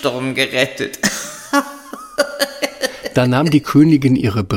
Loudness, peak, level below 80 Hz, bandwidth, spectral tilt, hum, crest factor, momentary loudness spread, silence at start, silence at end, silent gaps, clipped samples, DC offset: -16 LUFS; 0 dBFS; -48 dBFS; 17 kHz; -5 dB/octave; none; 16 dB; 11 LU; 0 s; 0 s; none; under 0.1%; under 0.1%